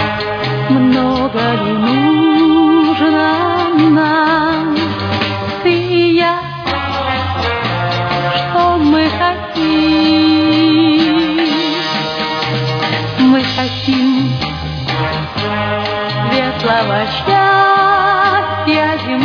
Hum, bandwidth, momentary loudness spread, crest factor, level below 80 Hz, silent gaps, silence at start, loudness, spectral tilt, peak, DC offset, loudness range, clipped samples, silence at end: none; 5.4 kHz; 7 LU; 12 dB; -40 dBFS; none; 0 s; -13 LUFS; -6.5 dB/octave; 0 dBFS; under 0.1%; 3 LU; under 0.1%; 0 s